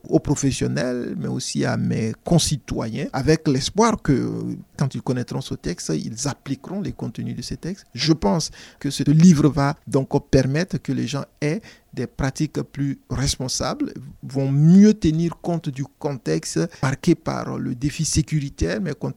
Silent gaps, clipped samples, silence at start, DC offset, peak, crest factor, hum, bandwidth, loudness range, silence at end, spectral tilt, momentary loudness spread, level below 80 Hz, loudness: none; under 0.1%; 0.05 s; under 0.1%; -4 dBFS; 18 dB; none; 14 kHz; 6 LU; 0.05 s; -5.5 dB/octave; 12 LU; -42 dBFS; -22 LUFS